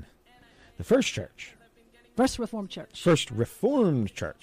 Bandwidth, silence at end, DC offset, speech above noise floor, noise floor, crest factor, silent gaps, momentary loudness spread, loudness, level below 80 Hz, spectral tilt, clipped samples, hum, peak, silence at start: 15.5 kHz; 0.1 s; under 0.1%; 33 dB; -60 dBFS; 16 dB; none; 17 LU; -27 LUFS; -54 dBFS; -5.5 dB/octave; under 0.1%; none; -12 dBFS; 0 s